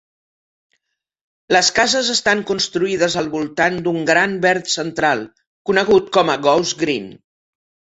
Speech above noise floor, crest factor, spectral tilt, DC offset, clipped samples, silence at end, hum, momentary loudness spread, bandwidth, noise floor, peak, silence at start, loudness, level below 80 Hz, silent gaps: 56 dB; 18 dB; -3 dB/octave; under 0.1%; under 0.1%; 0.8 s; none; 7 LU; 8.2 kHz; -73 dBFS; -2 dBFS; 1.5 s; -17 LUFS; -56 dBFS; 5.47-5.65 s